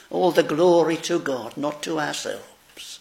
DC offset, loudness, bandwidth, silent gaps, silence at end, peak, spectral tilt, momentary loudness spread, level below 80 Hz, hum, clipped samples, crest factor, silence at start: under 0.1%; -22 LUFS; 16 kHz; none; 0.05 s; -4 dBFS; -4.5 dB/octave; 17 LU; -68 dBFS; none; under 0.1%; 18 dB; 0.1 s